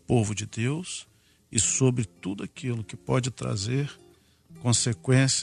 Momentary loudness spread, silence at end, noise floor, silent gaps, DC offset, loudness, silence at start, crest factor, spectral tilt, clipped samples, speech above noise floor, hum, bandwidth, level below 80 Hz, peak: 12 LU; 0 s; -56 dBFS; none; under 0.1%; -27 LUFS; 0.1 s; 22 dB; -4.5 dB/octave; under 0.1%; 29 dB; none; 11.5 kHz; -56 dBFS; -6 dBFS